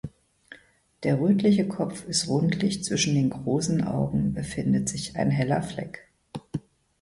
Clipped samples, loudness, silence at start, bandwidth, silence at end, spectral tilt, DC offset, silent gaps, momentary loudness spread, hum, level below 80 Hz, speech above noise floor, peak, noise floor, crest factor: under 0.1%; -26 LUFS; 0.05 s; 11.5 kHz; 0.4 s; -5.5 dB/octave; under 0.1%; none; 15 LU; none; -52 dBFS; 30 dB; -10 dBFS; -54 dBFS; 16 dB